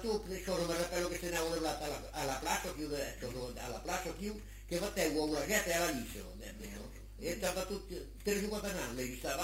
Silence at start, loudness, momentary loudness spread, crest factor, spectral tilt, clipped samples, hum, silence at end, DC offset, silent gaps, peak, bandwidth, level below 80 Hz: 0 s; -38 LUFS; 13 LU; 22 dB; -3.5 dB/octave; under 0.1%; none; 0 s; under 0.1%; none; -16 dBFS; 16 kHz; -50 dBFS